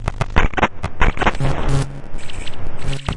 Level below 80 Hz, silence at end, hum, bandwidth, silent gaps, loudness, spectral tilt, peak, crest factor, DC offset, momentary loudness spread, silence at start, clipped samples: -22 dBFS; 0 s; none; 11 kHz; none; -21 LUFS; -5.5 dB/octave; 0 dBFS; 16 dB; under 0.1%; 13 LU; 0 s; under 0.1%